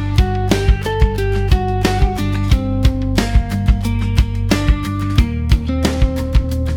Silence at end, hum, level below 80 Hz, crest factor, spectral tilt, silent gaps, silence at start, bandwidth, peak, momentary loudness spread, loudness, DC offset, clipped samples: 0 s; none; -18 dBFS; 14 dB; -6.5 dB/octave; none; 0 s; 16.5 kHz; 0 dBFS; 2 LU; -17 LUFS; under 0.1%; under 0.1%